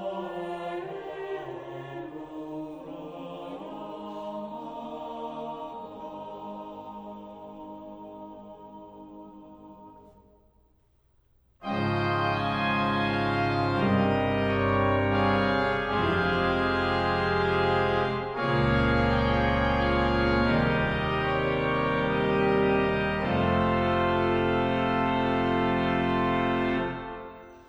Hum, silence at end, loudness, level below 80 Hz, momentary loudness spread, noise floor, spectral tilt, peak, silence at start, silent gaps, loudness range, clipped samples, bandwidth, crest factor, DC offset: none; 0.05 s; -26 LUFS; -42 dBFS; 17 LU; -65 dBFS; -7.5 dB/octave; -12 dBFS; 0 s; none; 17 LU; under 0.1%; 9.6 kHz; 16 dB; under 0.1%